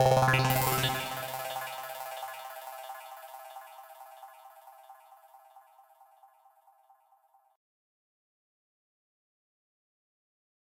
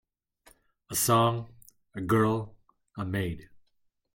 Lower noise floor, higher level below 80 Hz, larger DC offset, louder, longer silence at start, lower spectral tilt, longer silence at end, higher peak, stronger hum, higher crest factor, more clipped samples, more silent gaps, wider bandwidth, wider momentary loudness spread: second, -67 dBFS vs -72 dBFS; about the same, -60 dBFS vs -60 dBFS; neither; second, -31 LUFS vs -28 LUFS; second, 0 s vs 0.9 s; about the same, -4 dB/octave vs -5 dB/octave; first, 5.05 s vs 0.7 s; about the same, -12 dBFS vs -12 dBFS; neither; about the same, 24 dB vs 20 dB; neither; neither; about the same, 17 kHz vs 17 kHz; first, 28 LU vs 21 LU